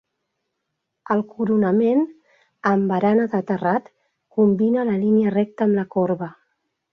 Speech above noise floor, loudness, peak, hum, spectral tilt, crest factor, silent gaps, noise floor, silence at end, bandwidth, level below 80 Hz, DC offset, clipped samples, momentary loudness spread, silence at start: 59 dB; -20 LUFS; -6 dBFS; none; -10 dB/octave; 14 dB; none; -78 dBFS; 0.6 s; 6 kHz; -66 dBFS; under 0.1%; under 0.1%; 8 LU; 1.1 s